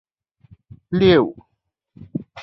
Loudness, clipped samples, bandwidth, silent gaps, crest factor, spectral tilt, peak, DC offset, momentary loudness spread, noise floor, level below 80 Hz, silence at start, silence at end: -17 LUFS; under 0.1%; 6 kHz; none; 20 dB; -8.5 dB/octave; -2 dBFS; under 0.1%; 18 LU; -74 dBFS; -48 dBFS; 0.9 s; 0 s